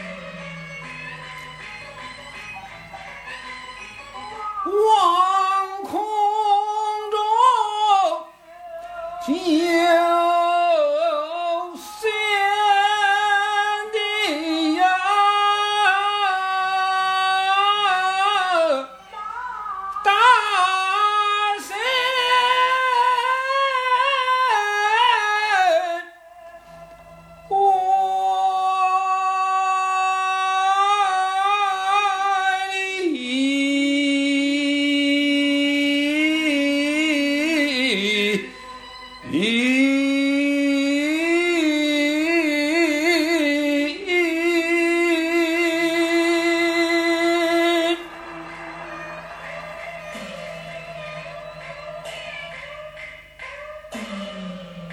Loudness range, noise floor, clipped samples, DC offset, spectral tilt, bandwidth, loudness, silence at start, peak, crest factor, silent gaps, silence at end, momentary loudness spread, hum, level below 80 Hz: 15 LU; -44 dBFS; under 0.1%; under 0.1%; -3 dB/octave; 14.5 kHz; -19 LUFS; 0 s; -6 dBFS; 16 dB; none; 0 s; 17 LU; none; -60 dBFS